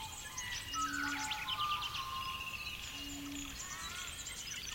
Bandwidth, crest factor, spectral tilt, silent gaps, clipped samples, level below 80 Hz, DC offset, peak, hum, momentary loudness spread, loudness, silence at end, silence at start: 16.5 kHz; 16 dB; -1 dB/octave; none; under 0.1%; -58 dBFS; under 0.1%; -26 dBFS; none; 7 LU; -40 LUFS; 0 s; 0 s